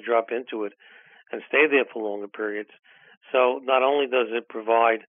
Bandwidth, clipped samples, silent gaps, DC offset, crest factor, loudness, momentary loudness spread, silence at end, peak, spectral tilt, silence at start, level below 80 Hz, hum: 3.7 kHz; under 0.1%; 3.17-3.21 s; under 0.1%; 20 dB; -23 LUFS; 15 LU; 0.1 s; -6 dBFS; 3.5 dB/octave; 0.05 s; under -90 dBFS; none